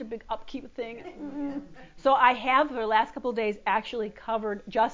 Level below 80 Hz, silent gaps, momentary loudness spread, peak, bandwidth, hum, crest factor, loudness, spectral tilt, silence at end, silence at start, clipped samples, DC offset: -58 dBFS; none; 17 LU; -6 dBFS; 7.6 kHz; none; 20 dB; -27 LUFS; -5 dB/octave; 0 s; 0 s; under 0.1%; under 0.1%